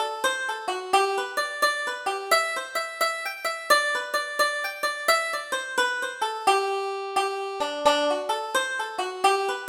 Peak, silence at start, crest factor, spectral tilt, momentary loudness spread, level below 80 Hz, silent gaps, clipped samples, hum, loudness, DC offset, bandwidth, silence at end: -6 dBFS; 0 s; 20 dB; 0 dB/octave; 7 LU; -68 dBFS; none; under 0.1%; none; -25 LUFS; under 0.1%; 19.5 kHz; 0 s